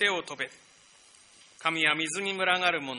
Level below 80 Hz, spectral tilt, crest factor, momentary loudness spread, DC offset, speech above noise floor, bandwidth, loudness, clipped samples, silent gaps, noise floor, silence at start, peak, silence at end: -76 dBFS; -2 dB/octave; 22 dB; 11 LU; under 0.1%; 28 dB; 10.5 kHz; -27 LUFS; under 0.1%; none; -57 dBFS; 0 s; -10 dBFS; 0 s